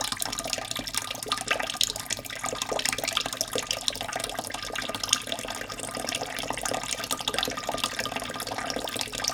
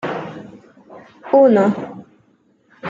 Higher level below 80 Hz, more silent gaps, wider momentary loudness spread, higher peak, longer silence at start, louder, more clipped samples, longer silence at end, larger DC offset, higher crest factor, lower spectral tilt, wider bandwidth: first, -54 dBFS vs -68 dBFS; neither; second, 6 LU vs 24 LU; about the same, -2 dBFS vs -2 dBFS; about the same, 0 s vs 0.05 s; second, -29 LUFS vs -15 LUFS; neither; about the same, 0 s vs 0 s; neither; first, 30 dB vs 18 dB; second, -1 dB/octave vs -8 dB/octave; first, over 20 kHz vs 7.6 kHz